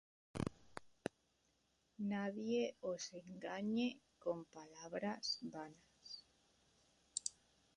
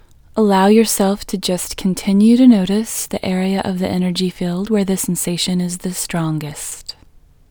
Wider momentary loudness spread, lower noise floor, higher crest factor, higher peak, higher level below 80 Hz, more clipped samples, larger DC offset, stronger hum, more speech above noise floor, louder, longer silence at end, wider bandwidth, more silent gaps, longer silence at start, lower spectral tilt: first, 15 LU vs 11 LU; first, -80 dBFS vs -47 dBFS; first, 24 dB vs 16 dB; second, -22 dBFS vs 0 dBFS; second, -74 dBFS vs -44 dBFS; neither; neither; neither; first, 37 dB vs 31 dB; second, -45 LUFS vs -16 LUFS; second, 0.45 s vs 0.6 s; second, 11 kHz vs over 20 kHz; neither; about the same, 0.35 s vs 0.35 s; about the same, -4 dB/octave vs -5 dB/octave